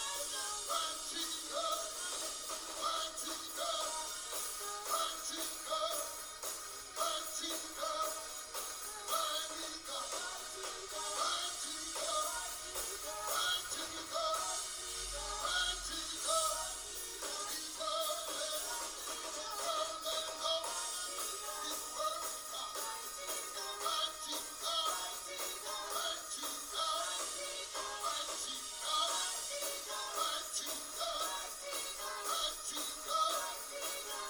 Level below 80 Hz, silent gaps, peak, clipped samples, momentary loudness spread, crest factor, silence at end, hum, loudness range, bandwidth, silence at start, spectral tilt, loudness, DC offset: -64 dBFS; none; -22 dBFS; under 0.1%; 6 LU; 18 dB; 0 s; none; 2 LU; over 20 kHz; 0 s; 1 dB/octave; -38 LUFS; under 0.1%